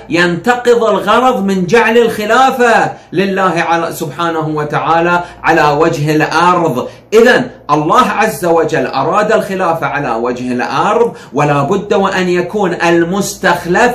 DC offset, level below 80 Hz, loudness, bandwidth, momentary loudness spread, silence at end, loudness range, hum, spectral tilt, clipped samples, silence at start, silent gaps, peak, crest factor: under 0.1%; -44 dBFS; -11 LUFS; 15 kHz; 6 LU; 0 s; 3 LU; none; -5 dB/octave; under 0.1%; 0 s; none; 0 dBFS; 12 dB